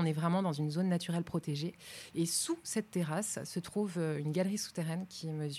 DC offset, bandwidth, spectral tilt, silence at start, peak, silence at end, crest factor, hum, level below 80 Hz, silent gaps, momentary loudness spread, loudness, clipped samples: under 0.1%; 15 kHz; -5 dB/octave; 0 s; -18 dBFS; 0 s; 16 dB; none; -72 dBFS; none; 7 LU; -35 LUFS; under 0.1%